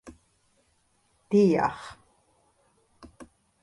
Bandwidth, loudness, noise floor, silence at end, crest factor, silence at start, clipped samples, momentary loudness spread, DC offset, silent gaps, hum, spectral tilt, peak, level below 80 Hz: 11.5 kHz; -24 LUFS; -69 dBFS; 0.4 s; 20 dB; 0.05 s; under 0.1%; 29 LU; under 0.1%; none; none; -7.5 dB/octave; -12 dBFS; -62 dBFS